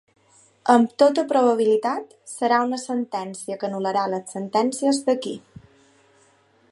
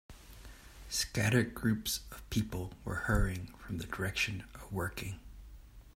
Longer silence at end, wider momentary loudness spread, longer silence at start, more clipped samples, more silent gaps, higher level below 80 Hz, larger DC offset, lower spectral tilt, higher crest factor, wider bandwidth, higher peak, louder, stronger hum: first, 1.35 s vs 0.05 s; second, 12 LU vs 23 LU; first, 0.65 s vs 0.1 s; neither; neither; second, -70 dBFS vs -46 dBFS; neither; about the same, -4.5 dB/octave vs -4.5 dB/octave; about the same, 22 dB vs 22 dB; second, 11.5 kHz vs 16 kHz; first, -2 dBFS vs -14 dBFS; first, -22 LUFS vs -35 LUFS; neither